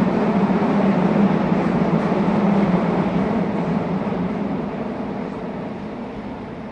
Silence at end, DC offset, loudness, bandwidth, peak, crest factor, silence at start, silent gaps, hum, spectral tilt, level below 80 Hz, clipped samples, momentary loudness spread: 0 s; under 0.1%; -20 LUFS; 7 kHz; -4 dBFS; 16 dB; 0 s; none; none; -9 dB/octave; -44 dBFS; under 0.1%; 12 LU